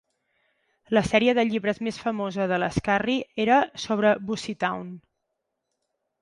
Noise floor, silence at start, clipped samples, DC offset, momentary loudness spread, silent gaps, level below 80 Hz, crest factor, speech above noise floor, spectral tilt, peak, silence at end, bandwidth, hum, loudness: -80 dBFS; 0.9 s; under 0.1%; under 0.1%; 8 LU; none; -54 dBFS; 20 dB; 56 dB; -5.5 dB/octave; -6 dBFS; 1.25 s; 11.5 kHz; none; -24 LUFS